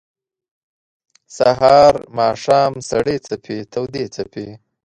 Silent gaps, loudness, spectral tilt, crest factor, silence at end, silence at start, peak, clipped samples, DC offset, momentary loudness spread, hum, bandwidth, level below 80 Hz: none; -16 LUFS; -5 dB/octave; 18 dB; 0.3 s; 1.3 s; 0 dBFS; under 0.1%; under 0.1%; 17 LU; none; 11 kHz; -50 dBFS